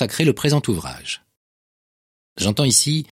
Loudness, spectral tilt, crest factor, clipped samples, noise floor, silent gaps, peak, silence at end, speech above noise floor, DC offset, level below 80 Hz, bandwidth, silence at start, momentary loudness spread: -19 LUFS; -4 dB/octave; 20 dB; under 0.1%; under -90 dBFS; 1.37-2.36 s; 0 dBFS; 0.15 s; over 70 dB; under 0.1%; -50 dBFS; 16.5 kHz; 0 s; 14 LU